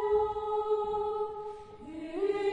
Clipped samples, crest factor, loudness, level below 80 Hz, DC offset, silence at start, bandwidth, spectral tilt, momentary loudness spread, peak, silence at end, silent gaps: under 0.1%; 14 dB; -32 LUFS; -58 dBFS; under 0.1%; 0 s; 8 kHz; -6 dB/octave; 14 LU; -18 dBFS; 0 s; none